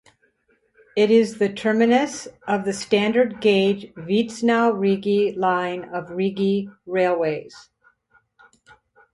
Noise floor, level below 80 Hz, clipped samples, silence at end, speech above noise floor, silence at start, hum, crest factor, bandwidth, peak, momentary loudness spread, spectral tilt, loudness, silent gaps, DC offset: -65 dBFS; -64 dBFS; under 0.1%; 1.55 s; 44 dB; 0.95 s; none; 16 dB; 11.5 kHz; -6 dBFS; 10 LU; -5.5 dB/octave; -21 LUFS; none; under 0.1%